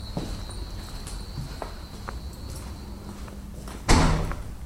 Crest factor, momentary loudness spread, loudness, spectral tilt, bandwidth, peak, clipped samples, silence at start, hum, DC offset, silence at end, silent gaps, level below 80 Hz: 26 dB; 18 LU; -31 LUFS; -5 dB/octave; 16 kHz; -4 dBFS; under 0.1%; 0 s; none; under 0.1%; 0 s; none; -32 dBFS